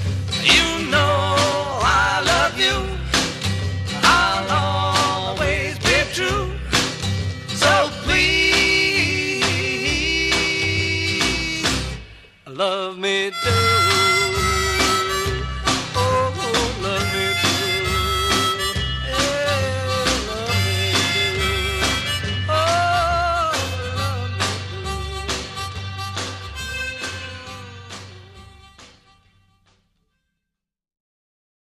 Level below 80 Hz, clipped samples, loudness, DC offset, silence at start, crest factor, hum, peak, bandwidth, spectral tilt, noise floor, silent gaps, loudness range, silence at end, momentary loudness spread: -34 dBFS; under 0.1%; -19 LUFS; under 0.1%; 0 s; 20 dB; none; -2 dBFS; 15.5 kHz; -3 dB/octave; -83 dBFS; none; 10 LU; 2.9 s; 12 LU